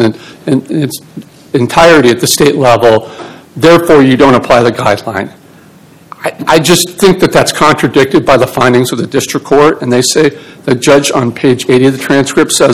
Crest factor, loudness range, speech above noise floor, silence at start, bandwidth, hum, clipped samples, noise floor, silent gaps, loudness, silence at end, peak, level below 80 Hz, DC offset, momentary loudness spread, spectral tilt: 8 dB; 3 LU; 30 dB; 0 s; over 20 kHz; none; 7%; -38 dBFS; none; -8 LUFS; 0 s; 0 dBFS; -38 dBFS; 0.5%; 12 LU; -4.5 dB/octave